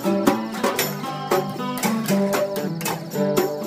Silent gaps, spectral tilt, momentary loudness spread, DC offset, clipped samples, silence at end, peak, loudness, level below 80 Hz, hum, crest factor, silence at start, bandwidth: none; -5 dB/octave; 5 LU; under 0.1%; under 0.1%; 0 s; -2 dBFS; -23 LUFS; -64 dBFS; none; 20 dB; 0 s; 16 kHz